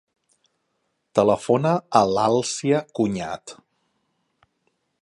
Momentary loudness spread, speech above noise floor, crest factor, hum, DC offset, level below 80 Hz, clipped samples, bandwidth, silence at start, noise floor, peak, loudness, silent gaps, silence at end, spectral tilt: 11 LU; 53 dB; 22 dB; none; under 0.1%; -60 dBFS; under 0.1%; 11.5 kHz; 1.15 s; -74 dBFS; -2 dBFS; -21 LUFS; none; 1.5 s; -5.5 dB/octave